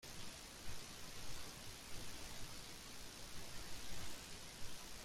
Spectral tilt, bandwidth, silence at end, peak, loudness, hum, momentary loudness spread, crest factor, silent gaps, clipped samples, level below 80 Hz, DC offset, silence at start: -2 dB/octave; 16 kHz; 0 s; -32 dBFS; -52 LUFS; none; 2 LU; 14 dB; none; under 0.1%; -60 dBFS; under 0.1%; 0 s